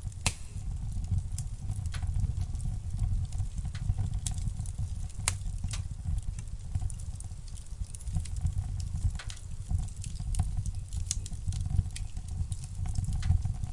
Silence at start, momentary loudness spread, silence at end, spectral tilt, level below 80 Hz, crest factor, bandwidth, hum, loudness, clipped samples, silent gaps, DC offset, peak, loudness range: 0 s; 8 LU; 0 s; -4.5 dB/octave; -36 dBFS; 26 dB; 11.5 kHz; none; -36 LUFS; under 0.1%; none; under 0.1%; -8 dBFS; 2 LU